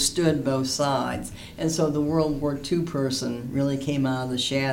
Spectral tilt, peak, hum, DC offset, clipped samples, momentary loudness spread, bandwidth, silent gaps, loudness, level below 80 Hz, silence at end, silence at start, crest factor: -5 dB/octave; -8 dBFS; none; under 0.1%; under 0.1%; 5 LU; 17 kHz; none; -25 LUFS; -48 dBFS; 0 s; 0 s; 16 dB